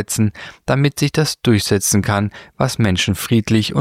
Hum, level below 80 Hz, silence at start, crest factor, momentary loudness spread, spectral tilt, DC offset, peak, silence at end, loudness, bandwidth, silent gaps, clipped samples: none; -44 dBFS; 0 s; 16 dB; 6 LU; -4.5 dB/octave; under 0.1%; -2 dBFS; 0 s; -17 LUFS; 16.5 kHz; none; under 0.1%